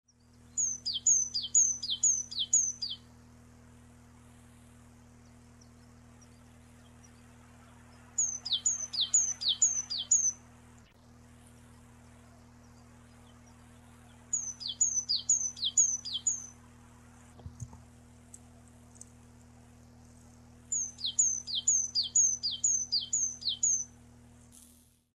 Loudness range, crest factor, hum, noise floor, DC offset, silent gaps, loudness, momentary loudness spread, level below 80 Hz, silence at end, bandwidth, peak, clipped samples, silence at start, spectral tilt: 12 LU; 20 dB; none; -62 dBFS; under 0.1%; none; -28 LUFS; 13 LU; -64 dBFS; 1.3 s; 14.5 kHz; -16 dBFS; under 0.1%; 0.55 s; 1 dB/octave